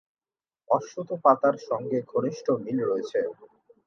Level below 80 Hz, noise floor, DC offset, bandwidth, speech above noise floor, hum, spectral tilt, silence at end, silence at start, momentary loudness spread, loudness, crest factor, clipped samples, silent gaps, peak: -80 dBFS; under -90 dBFS; under 0.1%; 7.2 kHz; over 64 dB; none; -7 dB/octave; 0.4 s; 0.7 s; 9 LU; -26 LUFS; 22 dB; under 0.1%; none; -6 dBFS